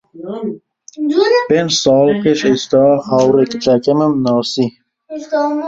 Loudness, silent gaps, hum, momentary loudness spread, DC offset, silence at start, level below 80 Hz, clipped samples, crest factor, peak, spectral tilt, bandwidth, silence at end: -14 LUFS; none; none; 13 LU; under 0.1%; 0.15 s; -54 dBFS; under 0.1%; 14 dB; 0 dBFS; -5 dB/octave; 8 kHz; 0 s